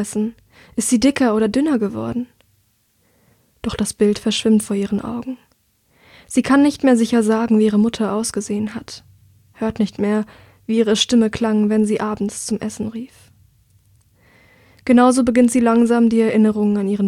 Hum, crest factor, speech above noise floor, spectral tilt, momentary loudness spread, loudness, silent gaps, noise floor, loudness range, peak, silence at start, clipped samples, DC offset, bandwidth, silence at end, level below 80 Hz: none; 18 dB; 45 dB; -5 dB/octave; 14 LU; -17 LUFS; none; -62 dBFS; 5 LU; 0 dBFS; 0 s; under 0.1%; under 0.1%; 14 kHz; 0 s; -50 dBFS